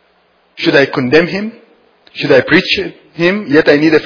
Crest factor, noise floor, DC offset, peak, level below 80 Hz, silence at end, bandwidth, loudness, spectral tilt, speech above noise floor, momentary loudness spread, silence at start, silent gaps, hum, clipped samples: 12 dB; -54 dBFS; under 0.1%; 0 dBFS; -48 dBFS; 0 s; 5.4 kHz; -11 LUFS; -6 dB/octave; 43 dB; 12 LU; 0.6 s; none; none; 0.6%